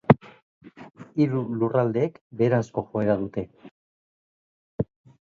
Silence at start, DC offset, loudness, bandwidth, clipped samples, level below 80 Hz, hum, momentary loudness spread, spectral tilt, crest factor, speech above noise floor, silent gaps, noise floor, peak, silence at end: 0.1 s; under 0.1%; -25 LUFS; 7.4 kHz; under 0.1%; -56 dBFS; none; 12 LU; -9 dB/octave; 26 dB; over 66 dB; 0.42-0.61 s, 2.21-2.30 s, 3.71-4.78 s; under -90 dBFS; 0 dBFS; 0.35 s